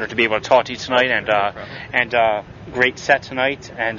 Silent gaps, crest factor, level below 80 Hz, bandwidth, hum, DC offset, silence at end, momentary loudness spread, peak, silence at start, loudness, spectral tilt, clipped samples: none; 18 dB; -50 dBFS; 7.4 kHz; none; under 0.1%; 0 s; 8 LU; -2 dBFS; 0 s; -18 LUFS; -4 dB/octave; under 0.1%